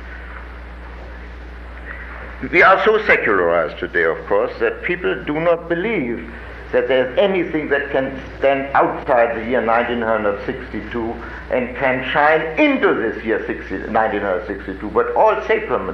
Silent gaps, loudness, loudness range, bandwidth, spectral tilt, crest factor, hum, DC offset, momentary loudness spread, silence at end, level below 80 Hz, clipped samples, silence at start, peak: none; -18 LUFS; 3 LU; 6.6 kHz; -7 dB/octave; 16 dB; none; under 0.1%; 19 LU; 0 s; -38 dBFS; under 0.1%; 0 s; -2 dBFS